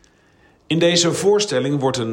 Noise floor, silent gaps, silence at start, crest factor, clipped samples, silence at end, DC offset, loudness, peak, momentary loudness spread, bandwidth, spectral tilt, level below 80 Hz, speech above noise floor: -54 dBFS; none; 0.7 s; 16 dB; under 0.1%; 0 s; under 0.1%; -17 LUFS; -4 dBFS; 5 LU; 16.5 kHz; -4 dB/octave; -60 dBFS; 37 dB